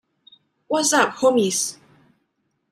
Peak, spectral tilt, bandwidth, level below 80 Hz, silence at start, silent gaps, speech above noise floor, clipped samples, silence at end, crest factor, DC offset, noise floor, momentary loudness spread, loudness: -4 dBFS; -2.5 dB/octave; 15.5 kHz; -70 dBFS; 0.7 s; none; 53 dB; under 0.1%; 0.95 s; 20 dB; under 0.1%; -72 dBFS; 8 LU; -19 LUFS